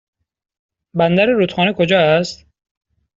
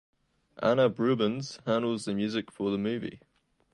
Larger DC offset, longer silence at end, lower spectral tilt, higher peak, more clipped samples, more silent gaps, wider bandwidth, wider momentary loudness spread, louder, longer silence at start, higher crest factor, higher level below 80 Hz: neither; first, 0.85 s vs 0.55 s; second, -4 dB/octave vs -6 dB/octave; first, -2 dBFS vs -12 dBFS; neither; neither; second, 7.8 kHz vs 11.5 kHz; about the same, 8 LU vs 9 LU; first, -15 LUFS vs -29 LUFS; first, 0.95 s vs 0.55 s; about the same, 16 dB vs 18 dB; first, -54 dBFS vs -68 dBFS